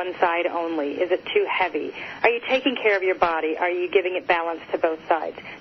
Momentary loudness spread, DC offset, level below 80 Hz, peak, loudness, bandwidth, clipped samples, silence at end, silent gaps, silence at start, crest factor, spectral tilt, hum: 5 LU; under 0.1%; -62 dBFS; -4 dBFS; -23 LUFS; 6.2 kHz; under 0.1%; 0 s; none; 0 s; 18 dB; -5 dB/octave; none